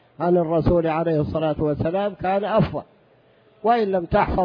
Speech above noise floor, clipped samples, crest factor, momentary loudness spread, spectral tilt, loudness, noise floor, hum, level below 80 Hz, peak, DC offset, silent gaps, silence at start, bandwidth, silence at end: 36 dB; under 0.1%; 16 dB; 4 LU; -10.5 dB/octave; -21 LUFS; -56 dBFS; none; -38 dBFS; -6 dBFS; under 0.1%; none; 0.2 s; 5.2 kHz; 0 s